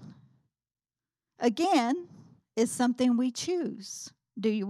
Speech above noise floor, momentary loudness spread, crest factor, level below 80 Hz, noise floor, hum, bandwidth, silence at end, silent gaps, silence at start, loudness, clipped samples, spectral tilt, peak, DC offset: over 62 dB; 15 LU; 18 dB; -80 dBFS; under -90 dBFS; none; 13.5 kHz; 0 s; none; 0 s; -29 LUFS; under 0.1%; -4 dB/octave; -12 dBFS; under 0.1%